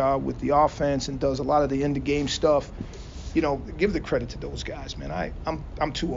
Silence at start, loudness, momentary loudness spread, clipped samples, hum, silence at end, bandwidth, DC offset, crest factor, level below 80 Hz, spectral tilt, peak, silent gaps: 0 s; -26 LUFS; 12 LU; under 0.1%; none; 0 s; 7.4 kHz; under 0.1%; 18 dB; -40 dBFS; -5 dB/octave; -6 dBFS; none